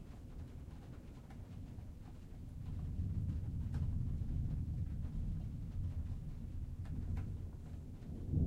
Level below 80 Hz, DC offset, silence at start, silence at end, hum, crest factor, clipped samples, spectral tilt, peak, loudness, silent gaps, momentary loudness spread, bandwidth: -46 dBFS; under 0.1%; 0 s; 0 s; none; 18 dB; under 0.1%; -9 dB/octave; -24 dBFS; -45 LUFS; none; 12 LU; 9 kHz